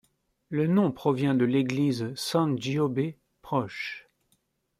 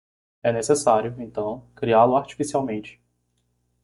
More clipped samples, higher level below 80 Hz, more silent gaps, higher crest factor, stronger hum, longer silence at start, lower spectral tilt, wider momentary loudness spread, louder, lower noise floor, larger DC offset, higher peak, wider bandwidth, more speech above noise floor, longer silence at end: neither; second, -66 dBFS vs -60 dBFS; neither; about the same, 16 dB vs 20 dB; second, none vs 60 Hz at -45 dBFS; about the same, 0.5 s vs 0.45 s; first, -6.5 dB/octave vs -5 dB/octave; about the same, 10 LU vs 12 LU; second, -27 LUFS vs -22 LUFS; about the same, -72 dBFS vs -71 dBFS; neither; second, -12 dBFS vs -4 dBFS; first, 15.5 kHz vs 11.5 kHz; about the same, 46 dB vs 49 dB; second, 0.8 s vs 0.95 s